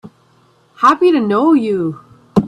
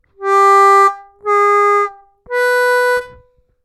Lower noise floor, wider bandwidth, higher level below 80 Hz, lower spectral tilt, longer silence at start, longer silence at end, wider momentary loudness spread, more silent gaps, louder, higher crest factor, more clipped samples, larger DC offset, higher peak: first, -53 dBFS vs -49 dBFS; second, 10.5 kHz vs 15 kHz; first, -50 dBFS vs -56 dBFS; first, -7.5 dB/octave vs -2 dB/octave; second, 0.05 s vs 0.2 s; second, 0 s vs 0.55 s; about the same, 10 LU vs 12 LU; neither; about the same, -14 LUFS vs -12 LUFS; about the same, 14 dB vs 10 dB; neither; neither; about the same, 0 dBFS vs -2 dBFS